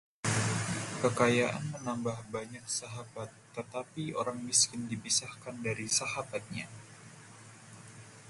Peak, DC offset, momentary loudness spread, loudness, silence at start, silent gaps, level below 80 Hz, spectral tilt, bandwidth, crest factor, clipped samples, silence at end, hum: -12 dBFS; under 0.1%; 24 LU; -32 LUFS; 0.25 s; none; -66 dBFS; -3 dB/octave; 12 kHz; 22 dB; under 0.1%; 0 s; none